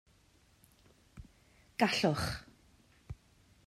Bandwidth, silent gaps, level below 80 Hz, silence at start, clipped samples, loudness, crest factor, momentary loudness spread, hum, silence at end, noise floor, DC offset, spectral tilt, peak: 15.5 kHz; none; -58 dBFS; 1.15 s; under 0.1%; -33 LUFS; 24 dB; 27 LU; none; 0.5 s; -67 dBFS; under 0.1%; -4.5 dB/octave; -14 dBFS